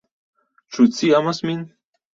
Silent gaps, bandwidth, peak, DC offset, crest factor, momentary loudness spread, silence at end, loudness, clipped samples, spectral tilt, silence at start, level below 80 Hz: none; 7.6 kHz; -4 dBFS; under 0.1%; 18 dB; 17 LU; 0.5 s; -19 LUFS; under 0.1%; -5.5 dB/octave; 0.7 s; -64 dBFS